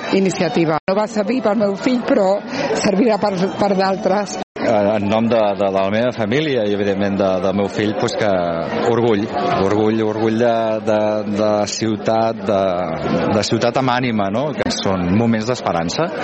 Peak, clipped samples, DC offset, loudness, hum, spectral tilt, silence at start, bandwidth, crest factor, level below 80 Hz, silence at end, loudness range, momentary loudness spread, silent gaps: -4 dBFS; under 0.1%; under 0.1%; -17 LUFS; none; -5.5 dB/octave; 0 s; 8.4 kHz; 14 dB; -50 dBFS; 0 s; 1 LU; 3 LU; 0.80-0.87 s, 4.43-4.55 s